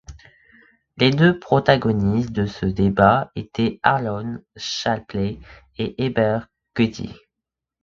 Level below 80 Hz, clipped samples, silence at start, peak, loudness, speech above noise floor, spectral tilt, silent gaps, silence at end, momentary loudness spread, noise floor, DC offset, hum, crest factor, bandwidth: -44 dBFS; under 0.1%; 0.1 s; 0 dBFS; -20 LUFS; 65 dB; -6.5 dB/octave; none; 0.7 s; 14 LU; -85 dBFS; under 0.1%; none; 20 dB; 7.6 kHz